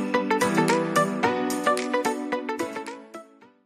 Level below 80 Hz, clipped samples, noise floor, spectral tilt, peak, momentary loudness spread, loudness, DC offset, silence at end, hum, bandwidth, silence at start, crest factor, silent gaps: -68 dBFS; under 0.1%; -46 dBFS; -4.5 dB/octave; -8 dBFS; 16 LU; -24 LUFS; under 0.1%; 0.4 s; none; 14.5 kHz; 0 s; 18 dB; none